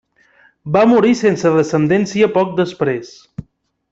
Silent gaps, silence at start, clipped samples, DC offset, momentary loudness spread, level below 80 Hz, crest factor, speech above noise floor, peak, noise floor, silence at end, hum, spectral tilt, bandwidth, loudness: none; 0.65 s; under 0.1%; under 0.1%; 22 LU; -54 dBFS; 14 dB; 38 dB; -2 dBFS; -52 dBFS; 0.5 s; none; -6.5 dB/octave; 8 kHz; -15 LUFS